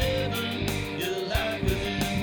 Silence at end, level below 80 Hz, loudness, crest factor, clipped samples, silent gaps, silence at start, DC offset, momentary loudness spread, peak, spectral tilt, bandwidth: 0 s; -38 dBFS; -28 LUFS; 16 dB; under 0.1%; none; 0 s; under 0.1%; 3 LU; -12 dBFS; -5 dB/octave; over 20 kHz